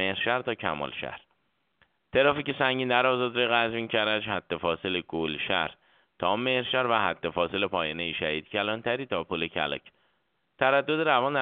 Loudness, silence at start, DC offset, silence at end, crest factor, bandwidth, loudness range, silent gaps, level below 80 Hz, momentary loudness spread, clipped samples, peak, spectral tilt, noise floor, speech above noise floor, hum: -27 LUFS; 0 s; under 0.1%; 0 s; 22 dB; 4.7 kHz; 3 LU; none; -62 dBFS; 8 LU; under 0.1%; -6 dBFS; -1.5 dB/octave; -74 dBFS; 47 dB; none